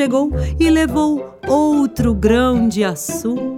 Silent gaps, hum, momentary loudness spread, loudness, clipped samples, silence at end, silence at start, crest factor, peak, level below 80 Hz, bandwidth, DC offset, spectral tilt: none; none; 7 LU; -16 LUFS; under 0.1%; 0 s; 0 s; 14 dB; -2 dBFS; -30 dBFS; 16.5 kHz; under 0.1%; -6 dB/octave